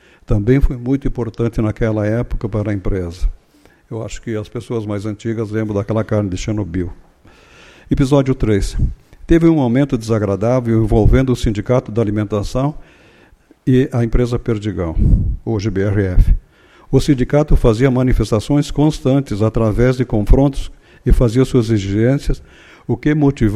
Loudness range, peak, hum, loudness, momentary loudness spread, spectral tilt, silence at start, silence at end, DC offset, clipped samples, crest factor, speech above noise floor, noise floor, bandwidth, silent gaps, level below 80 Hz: 6 LU; 0 dBFS; none; -17 LUFS; 10 LU; -8 dB/octave; 0.3 s; 0 s; under 0.1%; under 0.1%; 16 dB; 35 dB; -50 dBFS; 12.5 kHz; none; -22 dBFS